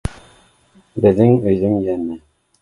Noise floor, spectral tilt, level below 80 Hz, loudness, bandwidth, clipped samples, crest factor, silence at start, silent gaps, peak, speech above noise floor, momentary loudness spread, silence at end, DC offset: -53 dBFS; -9.5 dB/octave; -40 dBFS; -16 LUFS; 11.5 kHz; under 0.1%; 18 dB; 0.05 s; none; 0 dBFS; 38 dB; 18 LU; 0.45 s; under 0.1%